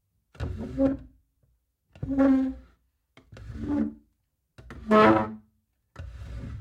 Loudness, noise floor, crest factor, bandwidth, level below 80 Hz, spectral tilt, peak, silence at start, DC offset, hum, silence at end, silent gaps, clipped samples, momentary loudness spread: -25 LUFS; -75 dBFS; 22 dB; 8 kHz; -46 dBFS; -8 dB/octave; -6 dBFS; 0.4 s; under 0.1%; none; 0 s; none; under 0.1%; 25 LU